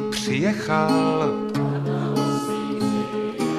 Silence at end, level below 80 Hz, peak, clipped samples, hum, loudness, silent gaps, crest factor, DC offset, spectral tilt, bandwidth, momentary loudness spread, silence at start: 0 s; -58 dBFS; -6 dBFS; under 0.1%; none; -23 LUFS; none; 16 dB; under 0.1%; -6 dB/octave; 15 kHz; 5 LU; 0 s